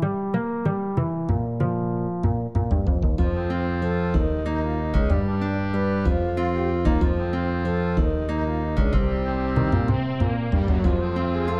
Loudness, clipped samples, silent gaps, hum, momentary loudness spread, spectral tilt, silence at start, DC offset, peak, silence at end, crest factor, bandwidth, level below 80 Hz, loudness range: -24 LUFS; under 0.1%; none; none; 3 LU; -9.5 dB/octave; 0 s; 0.7%; -8 dBFS; 0 s; 14 dB; 6.4 kHz; -26 dBFS; 1 LU